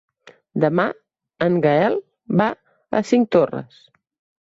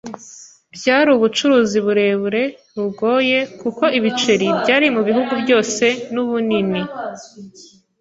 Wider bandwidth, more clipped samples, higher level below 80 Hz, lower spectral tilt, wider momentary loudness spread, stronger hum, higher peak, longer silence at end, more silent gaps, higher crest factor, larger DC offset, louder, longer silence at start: about the same, 8 kHz vs 8 kHz; neither; about the same, -62 dBFS vs -60 dBFS; first, -7.5 dB/octave vs -4 dB/octave; about the same, 13 LU vs 12 LU; neither; about the same, -4 dBFS vs -2 dBFS; first, 0.8 s vs 0.4 s; neither; about the same, 18 dB vs 16 dB; neither; second, -20 LUFS vs -17 LUFS; first, 0.55 s vs 0.05 s